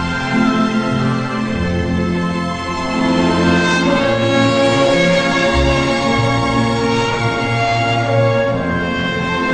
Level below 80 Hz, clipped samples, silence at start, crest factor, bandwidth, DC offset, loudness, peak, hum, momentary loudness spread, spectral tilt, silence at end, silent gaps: -32 dBFS; under 0.1%; 0 s; 14 dB; 10 kHz; under 0.1%; -15 LUFS; -2 dBFS; none; 5 LU; -5.5 dB/octave; 0 s; none